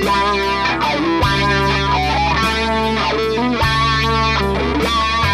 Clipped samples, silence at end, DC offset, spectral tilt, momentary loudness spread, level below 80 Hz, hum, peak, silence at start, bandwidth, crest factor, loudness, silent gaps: under 0.1%; 0 s; under 0.1%; -5 dB/octave; 2 LU; -28 dBFS; none; -4 dBFS; 0 s; 15.5 kHz; 12 dB; -16 LUFS; none